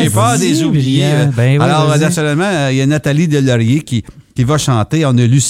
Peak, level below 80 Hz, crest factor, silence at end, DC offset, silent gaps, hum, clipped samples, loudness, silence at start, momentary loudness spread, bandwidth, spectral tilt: 0 dBFS; -42 dBFS; 10 dB; 0 s; under 0.1%; none; none; under 0.1%; -12 LUFS; 0 s; 4 LU; 15 kHz; -5.5 dB/octave